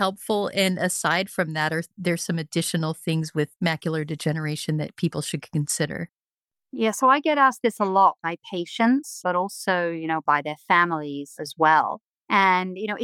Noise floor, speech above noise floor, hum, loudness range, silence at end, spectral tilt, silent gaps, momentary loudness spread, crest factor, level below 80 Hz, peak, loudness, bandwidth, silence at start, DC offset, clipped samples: -90 dBFS; 66 dB; none; 5 LU; 0 s; -4.5 dB/octave; 12.05-12.13 s; 10 LU; 18 dB; -70 dBFS; -6 dBFS; -23 LUFS; 16 kHz; 0 s; under 0.1%; under 0.1%